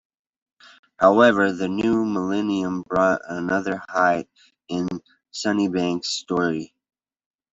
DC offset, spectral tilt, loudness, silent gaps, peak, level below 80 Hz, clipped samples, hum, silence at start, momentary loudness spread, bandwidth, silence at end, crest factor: under 0.1%; -5 dB/octave; -22 LUFS; none; -2 dBFS; -60 dBFS; under 0.1%; none; 1 s; 12 LU; 8.2 kHz; 0.85 s; 20 dB